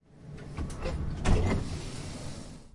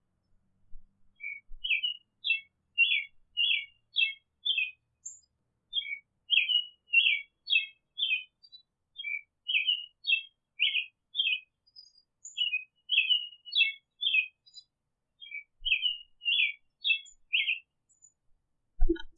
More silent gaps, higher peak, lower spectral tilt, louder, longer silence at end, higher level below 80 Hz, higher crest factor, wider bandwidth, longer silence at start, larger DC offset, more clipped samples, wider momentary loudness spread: neither; about the same, -12 dBFS vs -12 dBFS; first, -6 dB/octave vs -1 dB/octave; second, -34 LUFS vs -29 LUFS; about the same, 0.05 s vs 0.05 s; first, -36 dBFS vs -44 dBFS; about the same, 20 dB vs 20 dB; first, 11.5 kHz vs 7.8 kHz; second, 0.1 s vs 0.7 s; neither; neither; about the same, 16 LU vs 15 LU